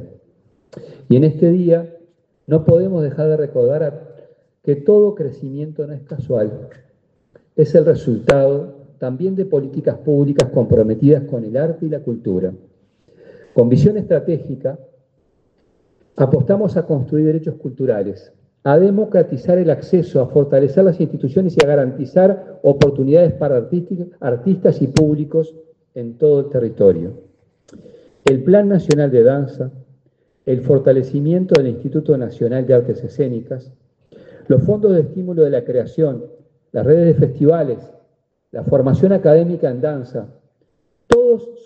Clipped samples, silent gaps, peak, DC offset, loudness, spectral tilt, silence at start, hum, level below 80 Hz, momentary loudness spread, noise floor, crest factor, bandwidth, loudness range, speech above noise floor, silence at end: under 0.1%; none; 0 dBFS; under 0.1%; -16 LUFS; -8.5 dB/octave; 0 s; none; -48 dBFS; 14 LU; -63 dBFS; 16 dB; 8.8 kHz; 4 LU; 48 dB; 0.05 s